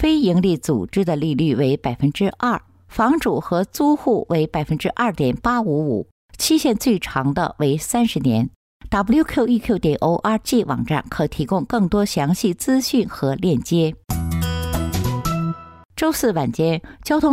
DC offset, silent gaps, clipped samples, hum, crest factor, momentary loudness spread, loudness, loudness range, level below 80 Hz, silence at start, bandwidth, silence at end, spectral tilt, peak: under 0.1%; 6.11-6.29 s, 8.56-8.80 s, 15.85-15.89 s; under 0.1%; none; 12 dB; 6 LU; -20 LUFS; 2 LU; -40 dBFS; 0 s; 16 kHz; 0 s; -6 dB/octave; -6 dBFS